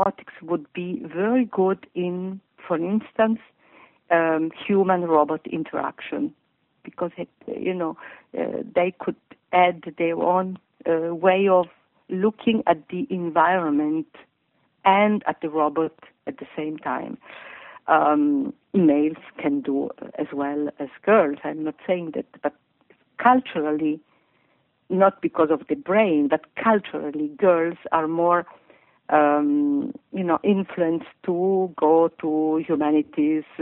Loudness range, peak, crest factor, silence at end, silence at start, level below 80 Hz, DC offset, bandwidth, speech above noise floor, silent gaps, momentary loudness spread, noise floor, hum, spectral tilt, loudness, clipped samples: 4 LU; -4 dBFS; 20 dB; 0 s; 0 s; -70 dBFS; under 0.1%; 4 kHz; 46 dB; none; 13 LU; -68 dBFS; none; -5 dB/octave; -23 LUFS; under 0.1%